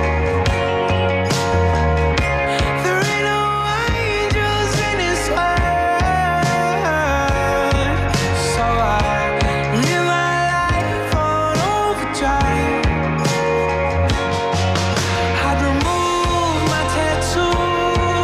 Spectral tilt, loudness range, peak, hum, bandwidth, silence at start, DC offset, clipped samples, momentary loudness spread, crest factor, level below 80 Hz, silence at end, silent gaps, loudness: -5 dB/octave; 1 LU; -2 dBFS; none; 15 kHz; 0 s; under 0.1%; under 0.1%; 2 LU; 16 dB; -28 dBFS; 0 s; none; -17 LUFS